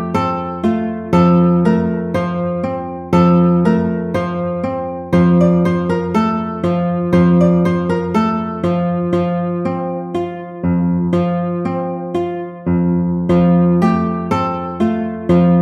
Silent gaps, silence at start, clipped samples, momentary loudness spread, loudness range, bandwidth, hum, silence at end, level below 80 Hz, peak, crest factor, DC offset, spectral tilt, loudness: none; 0 s; under 0.1%; 9 LU; 4 LU; 6.6 kHz; none; 0 s; -42 dBFS; 0 dBFS; 14 dB; under 0.1%; -9.5 dB/octave; -16 LUFS